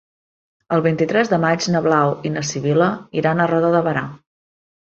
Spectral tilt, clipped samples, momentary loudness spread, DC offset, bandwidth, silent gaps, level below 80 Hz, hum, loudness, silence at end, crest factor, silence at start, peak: -6 dB/octave; under 0.1%; 6 LU; under 0.1%; 7.8 kHz; none; -58 dBFS; none; -18 LUFS; 0.8 s; 16 dB; 0.7 s; -2 dBFS